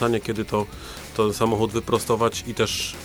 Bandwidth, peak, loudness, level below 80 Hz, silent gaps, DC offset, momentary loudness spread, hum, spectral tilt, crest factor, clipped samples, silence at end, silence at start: over 20 kHz; -6 dBFS; -24 LUFS; -46 dBFS; none; under 0.1%; 7 LU; none; -4.5 dB/octave; 18 dB; under 0.1%; 0 s; 0 s